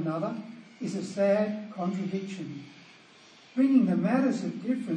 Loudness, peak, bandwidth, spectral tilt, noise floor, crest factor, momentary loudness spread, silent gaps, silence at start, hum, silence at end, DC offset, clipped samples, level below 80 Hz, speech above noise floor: -28 LUFS; -12 dBFS; 9.6 kHz; -7.5 dB/octave; -55 dBFS; 18 dB; 17 LU; none; 0 s; none; 0 s; under 0.1%; under 0.1%; -82 dBFS; 27 dB